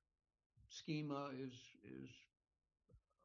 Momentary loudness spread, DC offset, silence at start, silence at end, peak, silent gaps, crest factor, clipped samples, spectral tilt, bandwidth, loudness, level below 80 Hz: 15 LU; under 0.1%; 0.55 s; 0.25 s; -32 dBFS; none; 20 dB; under 0.1%; -5.5 dB/octave; 7.2 kHz; -50 LUFS; -82 dBFS